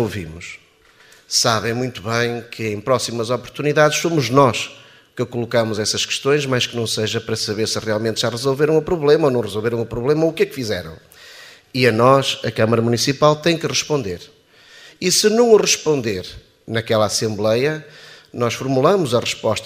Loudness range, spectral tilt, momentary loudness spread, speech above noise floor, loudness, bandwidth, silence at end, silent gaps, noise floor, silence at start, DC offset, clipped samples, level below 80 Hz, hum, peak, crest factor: 3 LU; -4 dB/octave; 12 LU; 32 dB; -18 LUFS; 15.5 kHz; 0 s; none; -50 dBFS; 0 s; under 0.1%; under 0.1%; -52 dBFS; none; 0 dBFS; 18 dB